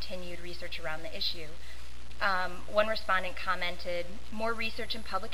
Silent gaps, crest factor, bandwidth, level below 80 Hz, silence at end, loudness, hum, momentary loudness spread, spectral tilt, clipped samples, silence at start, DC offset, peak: none; 22 dB; 16 kHz; -50 dBFS; 0 s; -33 LUFS; none; 13 LU; -3.5 dB/octave; under 0.1%; 0 s; 3%; -12 dBFS